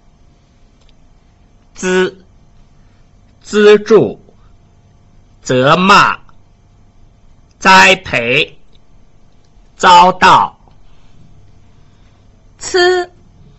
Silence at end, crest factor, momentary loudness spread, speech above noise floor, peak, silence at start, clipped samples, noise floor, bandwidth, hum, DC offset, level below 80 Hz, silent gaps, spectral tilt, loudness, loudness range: 0.55 s; 14 dB; 14 LU; 39 dB; 0 dBFS; 1.75 s; under 0.1%; -47 dBFS; 14 kHz; none; under 0.1%; -44 dBFS; none; -4 dB/octave; -9 LUFS; 6 LU